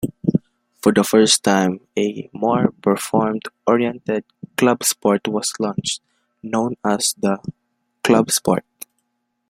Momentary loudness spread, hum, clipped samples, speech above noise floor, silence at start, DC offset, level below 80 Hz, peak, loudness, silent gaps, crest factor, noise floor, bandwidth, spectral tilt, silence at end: 11 LU; none; under 0.1%; 54 dB; 0 s; under 0.1%; -58 dBFS; 0 dBFS; -19 LUFS; none; 20 dB; -73 dBFS; 16.5 kHz; -4 dB/octave; 0.9 s